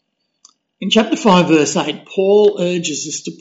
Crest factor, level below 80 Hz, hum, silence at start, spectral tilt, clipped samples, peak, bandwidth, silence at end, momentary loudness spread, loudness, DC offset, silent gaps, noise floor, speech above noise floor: 14 dB; -60 dBFS; none; 0.8 s; -4 dB/octave; under 0.1%; -2 dBFS; 8 kHz; 0.05 s; 10 LU; -15 LUFS; under 0.1%; none; -53 dBFS; 39 dB